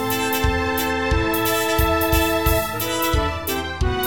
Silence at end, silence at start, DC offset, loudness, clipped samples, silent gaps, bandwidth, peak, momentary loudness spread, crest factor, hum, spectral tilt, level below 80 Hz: 0 s; 0 s; 0.8%; -20 LUFS; under 0.1%; none; 18 kHz; -4 dBFS; 5 LU; 16 dB; none; -4.5 dB/octave; -28 dBFS